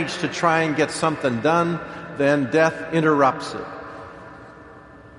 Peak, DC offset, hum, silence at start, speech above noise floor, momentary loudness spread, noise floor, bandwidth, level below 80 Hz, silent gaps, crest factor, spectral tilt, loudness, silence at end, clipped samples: -4 dBFS; under 0.1%; none; 0 s; 23 dB; 20 LU; -44 dBFS; 11.5 kHz; -56 dBFS; none; 18 dB; -5.5 dB/octave; -21 LUFS; 0 s; under 0.1%